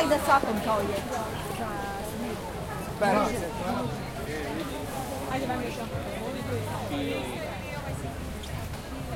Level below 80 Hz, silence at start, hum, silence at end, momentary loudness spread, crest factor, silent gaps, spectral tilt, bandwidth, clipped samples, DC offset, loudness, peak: -46 dBFS; 0 s; none; 0 s; 10 LU; 22 dB; none; -5 dB/octave; 16.5 kHz; under 0.1%; under 0.1%; -31 LUFS; -8 dBFS